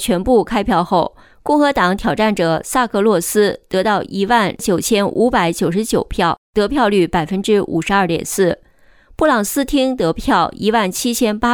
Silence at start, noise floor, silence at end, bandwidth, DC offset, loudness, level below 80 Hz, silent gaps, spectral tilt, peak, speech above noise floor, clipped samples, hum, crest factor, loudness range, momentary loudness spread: 0 s; -47 dBFS; 0 s; over 20 kHz; under 0.1%; -16 LUFS; -38 dBFS; 6.38-6.53 s; -4.5 dB/octave; -2 dBFS; 32 dB; under 0.1%; none; 12 dB; 1 LU; 4 LU